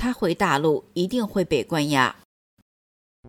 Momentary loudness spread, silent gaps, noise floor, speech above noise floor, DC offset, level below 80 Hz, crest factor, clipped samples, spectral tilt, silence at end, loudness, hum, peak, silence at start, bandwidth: 5 LU; 2.25-3.23 s; under -90 dBFS; over 67 dB; under 0.1%; -52 dBFS; 18 dB; under 0.1%; -5 dB/octave; 0 s; -23 LUFS; none; -6 dBFS; 0 s; 17.5 kHz